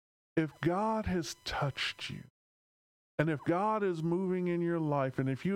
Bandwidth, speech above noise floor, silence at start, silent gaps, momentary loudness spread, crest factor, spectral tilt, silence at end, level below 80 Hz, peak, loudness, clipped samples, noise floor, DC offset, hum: 15.5 kHz; over 57 dB; 0.35 s; 2.30-3.18 s; 6 LU; 20 dB; -6 dB/octave; 0 s; -58 dBFS; -14 dBFS; -33 LUFS; under 0.1%; under -90 dBFS; under 0.1%; none